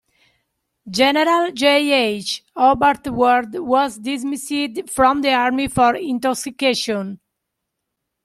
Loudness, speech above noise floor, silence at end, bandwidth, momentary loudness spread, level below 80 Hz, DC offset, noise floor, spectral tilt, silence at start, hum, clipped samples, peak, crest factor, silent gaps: -18 LUFS; 60 dB; 1.1 s; 15 kHz; 9 LU; -50 dBFS; under 0.1%; -78 dBFS; -3.5 dB/octave; 0.85 s; none; under 0.1%; -2 dBFS; 16 dB; none